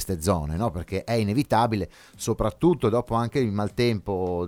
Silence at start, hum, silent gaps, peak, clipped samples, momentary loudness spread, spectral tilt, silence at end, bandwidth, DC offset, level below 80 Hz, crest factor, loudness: 0 s; none; none; -8 dBFS; under 0.1%; 8 LU; -6.5 dB/octave; 0 s; 17.5 kHz; under 0.1%; -42 dBFS; 16 dB; -25 LUFS